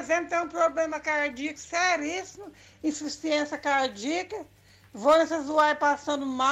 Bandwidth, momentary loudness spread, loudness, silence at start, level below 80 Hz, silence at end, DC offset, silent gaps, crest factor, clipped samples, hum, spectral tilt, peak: 13.5 kHz; 11 LU; -26 LUFS; 0 s; -64 dBFS; 0 s; under 0.1%; none; 16 dB; under 0.1%; none; -2.5 dB/octave; -12 dBFS